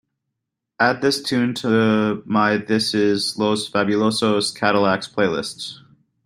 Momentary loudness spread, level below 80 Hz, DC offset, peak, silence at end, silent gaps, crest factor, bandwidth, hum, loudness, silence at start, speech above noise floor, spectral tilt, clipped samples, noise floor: 4 LU; -62 dBFS; under 0.1%; -2 dBFS; 0.5 s; none; 18 dB; 15.5 kHz; none; -19 LUFS; 0.8 s; 61 dB; -4.5 dB/octave; under 0.1%; -81 dBFS